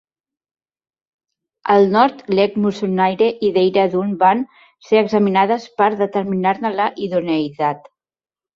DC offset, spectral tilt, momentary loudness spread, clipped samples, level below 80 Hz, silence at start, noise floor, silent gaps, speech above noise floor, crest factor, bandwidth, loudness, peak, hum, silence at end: under 0.1%; -7 dB/octave; 7 LU; under 0.1%; -62 dBFS; 1.65 s; under -90 dBFS; none; over 74 dB; 16 dB; 7.2 kHz; -17 LUFS; -2 dBFS; none; 0.75 s